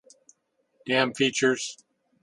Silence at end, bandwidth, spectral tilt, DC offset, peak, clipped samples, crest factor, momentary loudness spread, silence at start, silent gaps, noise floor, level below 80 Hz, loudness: 0.5 s; 11.5 kHz; -3 dB/octave; under 0.1%; -6 dBFS; under 0.1%; 24 dB; 13 LU; 0.85 s; none; -70 dBFS; -74 dBFS; -25 LUFS